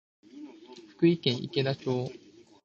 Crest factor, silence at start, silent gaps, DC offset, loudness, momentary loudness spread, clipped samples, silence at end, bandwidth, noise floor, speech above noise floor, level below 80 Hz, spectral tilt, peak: 20 dB; 0.35 s; none; under 0.1%; -29 LUFS; 23 LU; under 0.1%; 0.5 s; 7.4 kHz; -51 dBFS; 23 dB; -70 dBFS; -7 dB/octave; -10 dBFS